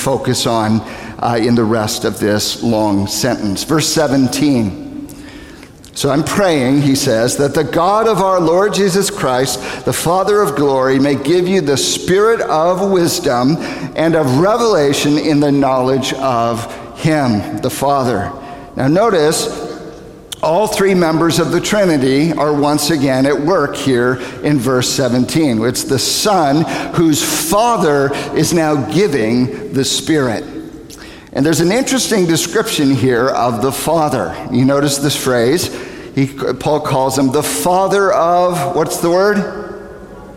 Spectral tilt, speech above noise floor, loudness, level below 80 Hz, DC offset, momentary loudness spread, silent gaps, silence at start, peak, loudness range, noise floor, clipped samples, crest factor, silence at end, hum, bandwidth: -4.5 dB/octave; 23 dB; -14 LUFS; -44 dBFS; 0.1%; 8 LU; none; 0 s; -2 dBFS; 3 LU; -36 dBFS; under 0.1%; 12 dB; 0 s; none; 16.5 kHz